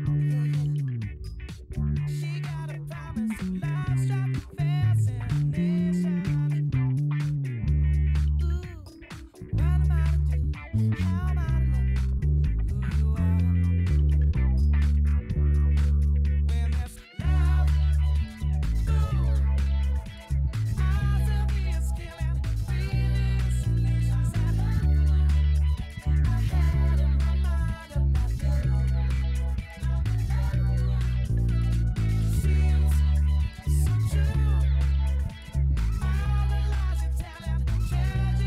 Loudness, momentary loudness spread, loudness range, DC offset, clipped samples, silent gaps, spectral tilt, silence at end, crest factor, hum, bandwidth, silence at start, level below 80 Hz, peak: -26 LUFS; 7 LU; 3 LU; under 0.1%; under 0.1%; none; -7.5 dB/octave; 0 s; 10 dB; none; 11.5 kHz; 0 s; -26 dBFS; -14 dBFS